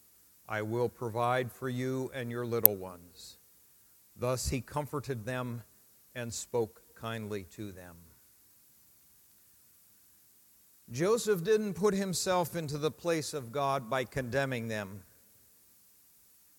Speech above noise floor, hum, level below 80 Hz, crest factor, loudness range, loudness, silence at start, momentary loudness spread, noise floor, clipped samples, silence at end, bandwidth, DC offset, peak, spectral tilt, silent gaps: 30 dB; none; -58 dBFS; 36 dB; 11 LU; -33 LUFS; 0.5 s; 16 LU; -63 dBFS; under 0.1%; 1.55 s; 17.5 kHz; under 0.1%; 0 dBFS; -4.5 dB/octave; none